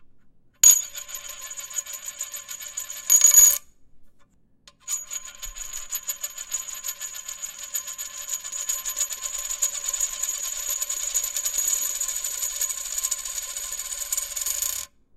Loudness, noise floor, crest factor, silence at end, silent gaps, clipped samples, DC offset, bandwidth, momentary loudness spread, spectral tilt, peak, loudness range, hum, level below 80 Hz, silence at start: -22 LUFS; -56 dBFS; 24 dB; 0.3 s; none; under 0.1%; under 0.1%; 17 kHz; 18 LU; 3.5 dB/octave; -2 dBFS; 12 LU; none; -54 dBFS; 0 s